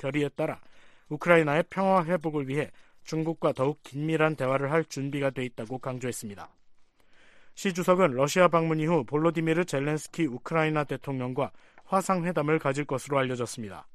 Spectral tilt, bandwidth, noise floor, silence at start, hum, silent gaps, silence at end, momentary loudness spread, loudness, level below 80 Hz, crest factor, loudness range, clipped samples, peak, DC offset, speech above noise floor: -6 dB/octave; 14 kHz; -56 dBFS; 0 s; none; none; 0.05 s; 12 LU; -28 LUFS; -64 dBFS; 22 dB; 5 LU; under 0.1%; -6 dBFS; under 0.1%; 29 dB